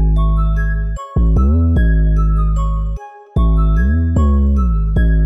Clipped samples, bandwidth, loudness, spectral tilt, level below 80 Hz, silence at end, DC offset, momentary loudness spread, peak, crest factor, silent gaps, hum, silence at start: under 0.1%; 3.7 kHz; -16 LUFS; -9.5 dB/octave; -14 dBFS; 0 s; 0.8%; 7 LU; -6 dBFS; 8 dB; none; none; 0 s